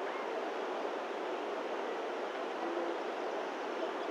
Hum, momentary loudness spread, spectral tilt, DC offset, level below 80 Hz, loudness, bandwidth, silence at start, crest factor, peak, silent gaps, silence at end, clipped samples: none; 2 LU; -3.5 dB/octave; under 0.1%; under -90 dBFS; -38 LUFS; 14 kHz; 0 s; 14 dB; -24 dBFS; none; 0 s; under 0.1%